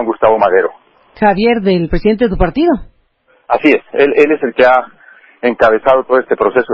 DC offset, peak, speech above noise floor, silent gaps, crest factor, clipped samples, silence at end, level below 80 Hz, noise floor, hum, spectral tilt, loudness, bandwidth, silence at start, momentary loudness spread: under 0.1%; 0 dBFS; 43 dB; none; 12 dB; under 0.1%; 0 s; -30 dBFS; -54 dBFS; none; -8 dB/octave; -12 LUFS; 7 kHz; 0 s; 6 LU